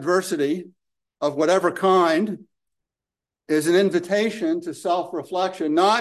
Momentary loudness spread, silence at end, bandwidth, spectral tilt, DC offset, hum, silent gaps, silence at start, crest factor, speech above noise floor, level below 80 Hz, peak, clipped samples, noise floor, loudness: 9 LU; 0 s; 12.5 kHz; -5 dB/octave; under 0.1%; none; none; 0 s; 16 dB; 69 dB; -74 dBFS; -6 dBFS; under 0.1%; -89 dBFS; -22 LUFS